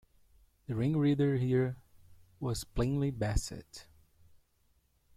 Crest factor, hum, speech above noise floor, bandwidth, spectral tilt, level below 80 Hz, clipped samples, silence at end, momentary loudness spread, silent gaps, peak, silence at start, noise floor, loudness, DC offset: 18 dB; none; 40 dB; 15 kHz; -7 dB/octave; -46 dBFS; under 0.1%; 1.35 s; 21 LU; none; -16 dBFS; 0.7 s; -72 dBFS; -33 LUFS; under 0.1%